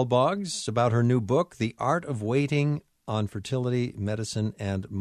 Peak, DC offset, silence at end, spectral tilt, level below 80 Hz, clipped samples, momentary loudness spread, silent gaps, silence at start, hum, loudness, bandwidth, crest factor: -10 dBFS; under 0.1%; 0 s; -6.5 dB/octave; -60 dBFS; under 0.1%; 7 LU; none; 0 s; none; -27 LUFS; 11.5 kHz; 16 dB